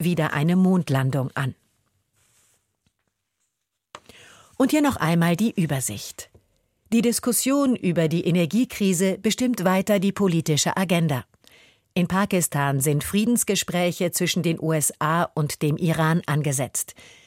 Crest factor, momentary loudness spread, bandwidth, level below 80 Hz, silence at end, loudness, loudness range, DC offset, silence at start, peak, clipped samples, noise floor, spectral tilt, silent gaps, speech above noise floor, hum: 16 dB; 6 LU; 16.5 kHz; -58 dBFS; 0.35 s; -22 LUFS; 5 LU; under 0.1%; 0 s; -8 dBFS; under 0.1%; -79 dBFS; -5 dB/octave; none; 57 dB; none